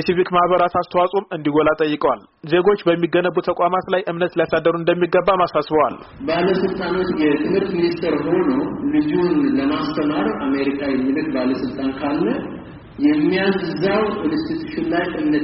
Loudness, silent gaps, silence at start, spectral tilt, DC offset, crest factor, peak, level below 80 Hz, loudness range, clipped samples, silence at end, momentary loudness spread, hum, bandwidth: -19 LUFS; none; 0 s; -5 dB/octave; under 0.1%; 14 dB; -4 dBFS; -48 dBFS; 2 LU; under 0.1%; 0 s; 5 LU; none; 5.8 kHz